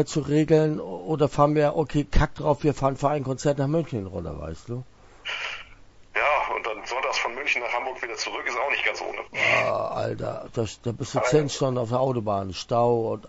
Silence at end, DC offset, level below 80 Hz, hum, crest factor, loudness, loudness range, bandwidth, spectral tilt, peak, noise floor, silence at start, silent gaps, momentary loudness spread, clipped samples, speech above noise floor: 0 s; under 0.1%; -40 dBFS; none; 18 dB; -25 LUFS; 5 LU; 8 kHz; -5.5 dB/octave; -6 dBFS; -49 dBFS; 0 s; none; 11 LU; under 0.1%; 24 dB